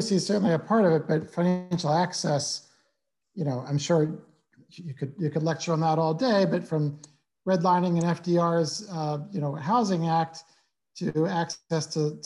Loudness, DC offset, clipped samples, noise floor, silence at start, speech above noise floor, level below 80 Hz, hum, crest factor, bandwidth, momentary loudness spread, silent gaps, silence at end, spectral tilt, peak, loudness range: -26 LUFS; under 0.1%; under 0.1%; -77 dBFS; 0 s; 52 dB; -70 dBFS; none; 16 dB; 11.5 kHz; 11 LU; none; 0.05 s; -6 dB/octave; -10 dBFS; 4 LU